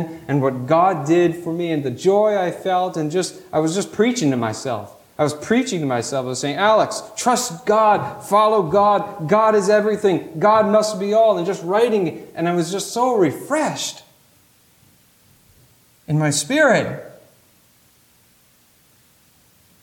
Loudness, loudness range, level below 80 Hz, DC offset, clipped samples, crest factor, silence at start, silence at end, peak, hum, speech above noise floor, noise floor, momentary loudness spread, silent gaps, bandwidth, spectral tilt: -19 LUFS; 6 LU; -62 dBFS; under 0.1%; under 0.1%; 16 dB; 0 s; 2.7 s; -2 dBFS; none; 38 dB; -56 dBFS; 8 LU; none; 18 kHz; -5 dB/octave